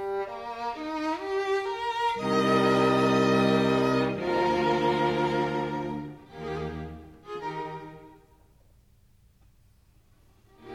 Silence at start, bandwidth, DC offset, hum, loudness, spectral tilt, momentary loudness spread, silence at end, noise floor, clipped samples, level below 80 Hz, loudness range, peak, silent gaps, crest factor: 0 s; 14.5 kHz; under 0.1%; none; -27 LUFS; -6 dB/octave; 16 LU; 0 s; -60 dBFS; under 0.1%; -54 dBFS; 18 LU; -12 dBFS; none; 16 dB